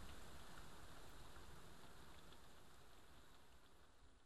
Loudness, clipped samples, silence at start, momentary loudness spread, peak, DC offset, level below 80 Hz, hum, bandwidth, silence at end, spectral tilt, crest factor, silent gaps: -63 LUFS; under 0.1%; 0 s; 7 LU; -44 dBFS; 0.1%; -68 dBFS; none; 13 kHz; 0 s; -3.5 dB/octave; 16 dB; none